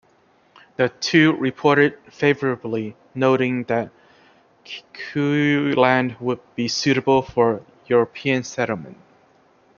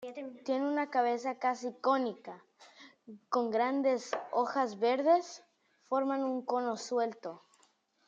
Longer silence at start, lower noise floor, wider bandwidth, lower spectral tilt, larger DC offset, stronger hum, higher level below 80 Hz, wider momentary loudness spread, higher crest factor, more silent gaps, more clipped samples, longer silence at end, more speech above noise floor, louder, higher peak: first, 0.8 s vs 0 s; second, -58 dBFS vs -70 dBFS; second, 7.2 kHz vs 8.2 kHz; first, -5.5 dB/octave vs -4 dB/octave; neither; neither; first, -60 dBFS vs under -90 dBFS; about the same, 14 LU vs 16 LU; about the same, 20 dB vs 18 dB; neither; neither; first, 0.85 s vs 0.7 s; about the same, 38 dB vs 38 dB; first, -20 LUFS vs -32 LUFS; first, -2 dBFS vs -16 dBFS